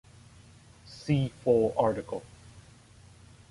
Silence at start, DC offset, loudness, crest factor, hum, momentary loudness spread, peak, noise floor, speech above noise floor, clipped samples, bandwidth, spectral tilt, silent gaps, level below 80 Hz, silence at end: 0.9 s; under 0.1%; -28 LUFS; 20 dB; none; 17 LU; -12 dBFS; -55 dBFS; 28 dB; under 0.1%; 11.5 kHz; -7.5 dB/octave; none; -58 dBFS; 0.9 s